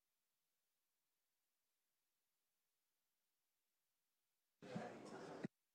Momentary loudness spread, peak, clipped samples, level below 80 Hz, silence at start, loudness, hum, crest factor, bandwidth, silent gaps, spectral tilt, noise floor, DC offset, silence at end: 3 LU; -36 dBFS; under 0.1%; under -90 dBFS; 4.6 s; -55 LUFS; none; 26 dB; 10 kHz; none; -6 dB/octave; under -90 dBFS; under 0.1%; 0.25 s